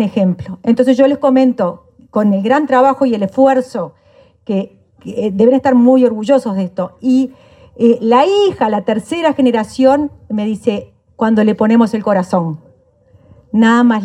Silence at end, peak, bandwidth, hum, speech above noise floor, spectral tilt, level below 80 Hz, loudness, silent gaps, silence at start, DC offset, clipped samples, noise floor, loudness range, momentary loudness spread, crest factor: 0 s; 0 dBFS; 11 kHz; none; 37 dB; -7 dB/octave; -54 dBFS; -13 LUFS; none; 0 s; under 0.1%; under 0.1%; -49 dBFS; 2 LU; 11 LU; 14 dB